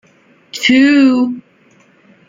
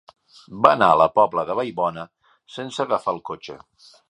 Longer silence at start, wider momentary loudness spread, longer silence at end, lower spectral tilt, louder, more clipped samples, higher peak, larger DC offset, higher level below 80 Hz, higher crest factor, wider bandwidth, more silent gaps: about the same, 0.55 s vs 0.5 s; second, 20 LU vs 23 LU; first, 0.9 s vs 0.55 s; second, -3.5 dB/octave vs -5.5 dB/octave; first, -11 LUFS vs -20 LUFS; neither; about the same, -2 dBFS vs 0 dBFS; neither; about the same, -60 dBFS vs -60 dBFS; second, 14 dB vs 22 dB; second, 7.6 kHz vs 10.5 kHz; neither